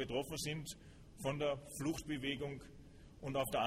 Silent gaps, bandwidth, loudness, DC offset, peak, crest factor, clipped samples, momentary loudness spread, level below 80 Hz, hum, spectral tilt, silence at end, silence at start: none; 16 kHz; -42 LUFS; under 0.1%; -24 dBFS; 16 dB; under 0.1%; 19 LU; -60 dBFS; none; -4.5 dB/octave; 0 s; 0 s